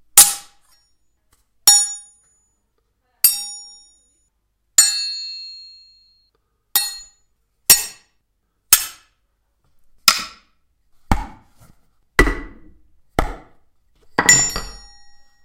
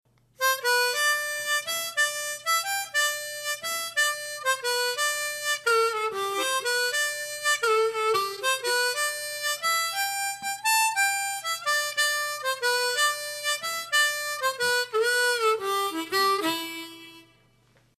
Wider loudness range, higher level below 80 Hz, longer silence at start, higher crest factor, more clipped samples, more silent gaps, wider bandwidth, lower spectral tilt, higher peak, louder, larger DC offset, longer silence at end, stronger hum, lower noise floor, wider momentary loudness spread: first, 6 LU vs 1 LU; first, -34 dBFS vs -78 dBFS; second, 0.15 s vs 0.4 s; first, 22 dB vs 16 dB; first, 0.1% vs under 0.1%; neither; first, 16 kHz vs 14 kHz; first, -0.5 dB/octave vs 1 dB/octave; first, 0 dBFS vs -12 dBFS; first, -15 LUFS vs -25 LUFS; neither; about the same, 0.7 s vs 0.75 s; neither; first, -69 dBFS vs -62 dBFS; first, 21 LU vs 6 LU